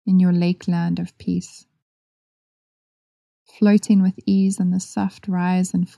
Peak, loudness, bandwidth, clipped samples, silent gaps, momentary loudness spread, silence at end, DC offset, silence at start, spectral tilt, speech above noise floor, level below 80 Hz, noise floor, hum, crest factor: -6 dBFS; -20 LUFS; 11.5 kHz; under 0.1%; 1.82-3.46 s; 10 LU; 0.1 s; under 0.1%; 0.05 s; -7 dB/octave; over 71 dB; -62 dBFS; under -90 dBFS; none; 16 dB